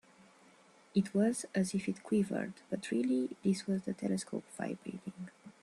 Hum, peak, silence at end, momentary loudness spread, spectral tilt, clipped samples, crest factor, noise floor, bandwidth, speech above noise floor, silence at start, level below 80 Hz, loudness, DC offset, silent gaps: none; -18 dBFS; 0.1 s; 12 LU; -6 dB/octave; under 0.1%; 18 dB; -63 dBFS; 12.5 kHz; 28 dB; 0.95 s; -74 dBFS; -36 LUFS; under 0.1%; none